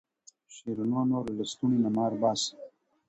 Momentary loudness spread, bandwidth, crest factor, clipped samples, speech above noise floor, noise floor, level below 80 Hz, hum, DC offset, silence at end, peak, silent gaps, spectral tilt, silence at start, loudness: 15 LU; 8.2 kHz; 18 dB; under 0.1%; 29 dB; -57 dBFS; -66 dBFS; none; under 0.1%; 0.4 s; -12 dBFS; none; -5.5 dB/octave; 0.5 s; -29 LUFS